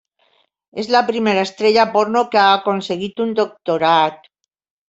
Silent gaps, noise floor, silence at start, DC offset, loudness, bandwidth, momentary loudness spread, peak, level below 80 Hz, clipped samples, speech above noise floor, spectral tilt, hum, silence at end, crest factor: none; -61 dBFS; 0.75 s; under 0.1%; -16 LUFS; 8 kHz; 8 LU; -2 dBFS; -64 dBFS; under 0.1%; 45 dB; -4.5 dB/octave; none; 0.75 s; 16 dB